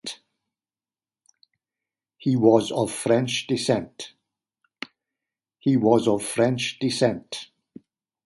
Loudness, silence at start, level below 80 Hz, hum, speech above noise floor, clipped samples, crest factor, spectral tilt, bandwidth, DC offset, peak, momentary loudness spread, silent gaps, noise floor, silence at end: -23 LUFS; 0.05 s; -64 dBFS; none; over 68 dB; under 0.1%; 22 dB; -5 dB/octave; 12 kHz; under 0.1%; -2 dBFS; 20 LU; none; under -90 dBFS; 0.85 s